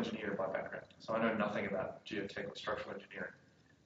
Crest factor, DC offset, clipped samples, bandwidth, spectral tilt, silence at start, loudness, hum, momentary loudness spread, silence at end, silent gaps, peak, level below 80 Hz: 22 dB; under 0.1%; under 0.1%; 7.6 kHz; -3.5 dB/octave; 0 s; -40 LUFS; none; 11 LU; 0.5 s; none; -18 dBFS; -72 dBFS